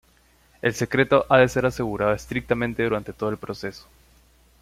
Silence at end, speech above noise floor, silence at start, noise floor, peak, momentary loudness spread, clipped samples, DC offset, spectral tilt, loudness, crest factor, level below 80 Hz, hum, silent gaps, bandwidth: 0.8 s; 36 dB; 0.65 s; -59 dBFS; -4 dBFS; 13 LU; under 0.1%; under 0.1%; -6 dB/octave; -23 LUFS; 20 dB; -48 dBFS; none; none; 15.5 kHz